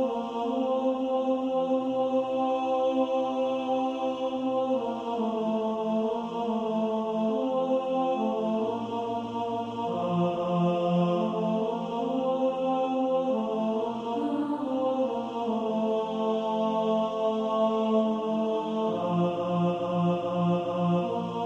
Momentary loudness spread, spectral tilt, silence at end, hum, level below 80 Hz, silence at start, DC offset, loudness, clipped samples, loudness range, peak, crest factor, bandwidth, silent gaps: 4 LU; -8 dB/octave; 0 s; none; -68 dBFS; 0 s; under 0.1%; -28 LUFS; under 0.1%; 2 LU; -14 dBFS; 14 dB; 8 kHz; none